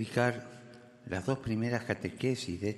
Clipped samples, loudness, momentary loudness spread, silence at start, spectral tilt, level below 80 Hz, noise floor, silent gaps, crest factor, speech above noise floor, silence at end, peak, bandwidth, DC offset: under 0.1%; -34 LUFS; 20 LU; 0 s; -6 dB/octave; -64 dBFS; -53 dBFS; none; 22 dB; 20 dB; 0 s; -12 dBFS; 12.5 kHz; under 0.1%